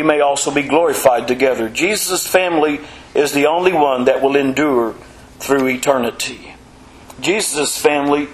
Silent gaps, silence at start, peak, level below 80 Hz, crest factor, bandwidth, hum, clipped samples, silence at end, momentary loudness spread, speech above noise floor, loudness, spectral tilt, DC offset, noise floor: none; 0 s; 0 dBFS; -48 dBFS; 16 dB; 15 kHz; none; under 0.1%; 0 s; 8 LU; 26 dB; -16 LUFS; -3 dB/octave; under 0.1%; -41 dBFS